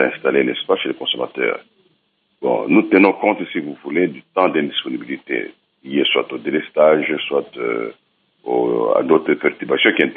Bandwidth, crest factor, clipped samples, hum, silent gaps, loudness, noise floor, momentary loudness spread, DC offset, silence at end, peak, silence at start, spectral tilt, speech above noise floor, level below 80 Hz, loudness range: 4.6 kHz; 18 dB; under 0.1%; none; none; -18 LUFS; -65 dBFS; 11 LU; under 0.1%; 0 s; 0 dBFS; 0 s; -8.5 dB/octave; 47 dB; -72 dBFS; 2 LU